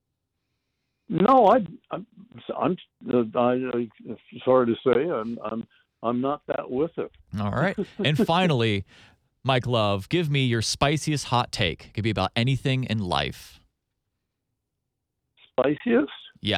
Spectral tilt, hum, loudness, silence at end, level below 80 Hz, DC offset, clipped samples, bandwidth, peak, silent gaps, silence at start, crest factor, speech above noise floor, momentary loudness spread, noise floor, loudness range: -5.5 dB/octave; none; -24 LUFS; 0 s; -52 dBFS; under 0.1%; under 0.1%; 15 kHz; -6 dBFS; none; 1.1 s; 20 dB; 57 dB; 13 LU; -81 dBFS; 5 LU